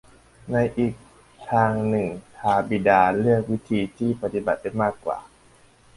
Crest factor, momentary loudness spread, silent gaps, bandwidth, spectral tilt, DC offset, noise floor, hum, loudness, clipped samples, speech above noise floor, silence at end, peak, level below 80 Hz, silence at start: 20 dB; 12 LU; none; 11.5 kHz; -8 dB/octave; under 0.1%; -55 dBFS; none; -23 LUFS; under 0.1%; 32 dB; 0.75 s; -4 dBFS; -52 dBFS; 0.45 s